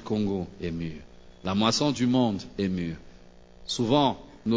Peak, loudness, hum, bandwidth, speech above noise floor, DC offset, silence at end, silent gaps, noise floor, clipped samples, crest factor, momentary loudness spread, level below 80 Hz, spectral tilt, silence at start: -8 dBFS; -27 LUFS; none; 8 kHz; 24 dB; under 0.1%; 0 s; none; -50 dBFS; under 0.1%; 20 dB; 14 LU; -50 dBFS; -5.5 dB/octave; 0 s